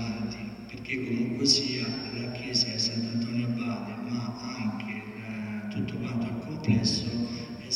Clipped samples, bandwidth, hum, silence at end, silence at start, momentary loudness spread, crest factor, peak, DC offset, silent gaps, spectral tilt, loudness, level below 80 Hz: under 0.1%; 12 kHz; none; 0 s; 0 s; 12 LU; 22 dB; -8 dBFS; under 0.1%; none; -4.5 dB/octave; -30 LUFS; -56 dBFS